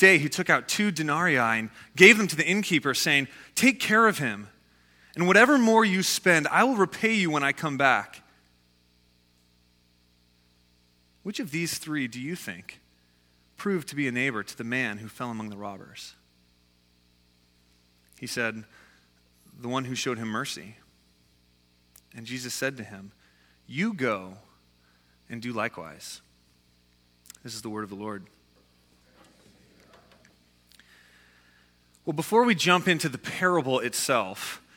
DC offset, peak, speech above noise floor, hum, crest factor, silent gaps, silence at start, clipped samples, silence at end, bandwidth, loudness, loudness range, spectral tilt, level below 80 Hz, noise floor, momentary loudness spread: under 0.1%; 0 dBFS; 39 dB; 60 Hz at -55 dBFS; 28 dB; none; 0 s; under 0.1%; 0.2 s; 18.5 kHz; -24 LUFS; 20 LU; -4 dB/octave; -68 dBFS; -64 dBFS; 21 LU